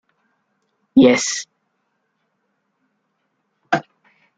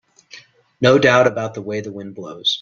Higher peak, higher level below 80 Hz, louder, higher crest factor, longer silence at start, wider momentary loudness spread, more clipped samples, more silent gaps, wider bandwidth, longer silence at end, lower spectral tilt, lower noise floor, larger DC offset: about the same, -2 dBFS vs 0 dBFS; second, -62 dBFS vs -56 dBFS; about the same, -17 LUFS vs -17 LUFS; about the same, 20 dB vs 18 dB; first, 0.95 s vs 0.35 s; second, 13 LU vs 19 LU; neither; neither; first, 9.2 kHz vs 7.6 kHz; first, 0.55 s vs 0 s; about the same, -4 dB/octave vs -5 dB/octave; first, -71 dBFS vs -45 dBFS; neither